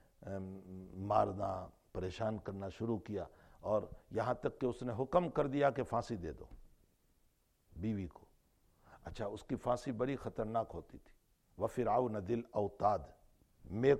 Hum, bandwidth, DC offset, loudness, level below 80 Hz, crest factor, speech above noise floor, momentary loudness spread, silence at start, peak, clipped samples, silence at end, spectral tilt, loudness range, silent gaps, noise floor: none; 13.5 kHz; under 0.1%; -39 LUFS; -60 dBFS; 22 dB; 37 dB; 14 LU; 0.2 s; -16 dBFS; under 0.1%; 0 s; -7.5 dB/octave; 7 LU; none; -74 dBFS